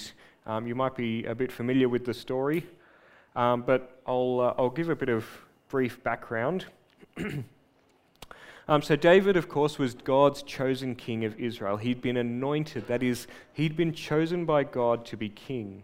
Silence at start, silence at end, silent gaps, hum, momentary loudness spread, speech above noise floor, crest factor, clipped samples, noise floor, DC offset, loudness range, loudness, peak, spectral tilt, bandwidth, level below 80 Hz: 0 s; 0 s; none; none; 14 LU; 37 dB; 22 dB; under 0.1%; -65 dBFS; under 0.1%; 6 LU; -28 LUFS; -6 dBFS; -6.5 dB/octave; 16 kHz; -60 dBFS